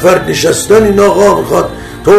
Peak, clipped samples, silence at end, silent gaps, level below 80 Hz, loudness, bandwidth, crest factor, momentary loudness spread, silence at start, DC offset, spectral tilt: 0 dBFS; 2%; 0 s; none; -32 dBFS; -9 LUFS; 14.5 kHz; 8 dB; 7 LU; 0 s; under 0.1%; -4.5 dB/octave